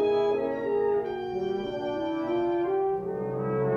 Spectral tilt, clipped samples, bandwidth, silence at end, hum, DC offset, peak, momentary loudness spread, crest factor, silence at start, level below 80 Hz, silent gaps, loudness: -8.5 dB/octave; under 0.1%; 6.6 kHz; 0 s; none; under 0.1%; -16 dBFS; 5 LU; 12 dB; 0 s; -60 dBFS; none; -28 LUFS